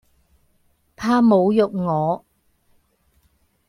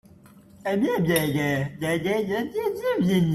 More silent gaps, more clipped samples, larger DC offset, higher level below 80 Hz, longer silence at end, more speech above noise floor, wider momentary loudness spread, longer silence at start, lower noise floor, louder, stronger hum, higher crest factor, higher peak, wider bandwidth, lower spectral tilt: neither; neither; neither; about the same, -58 dBFS vs -56 dBFS; first, 1.5 s vs 0 s; first, 46 dB vs 27 dB; first, 11 LU vs 5 LU; first, 1 s vs 0.35 s; first, -63 dBFS vs -51 dBFS; first, -19 LUFS vs -25 LUFS; neither; about the same, 18 dB vs 16 dB; first, -4 dBFS vs -8 dBFS; second, 11 kHz vs 14.5 kHz; first, -8 dB/octave vs -6 dB/octave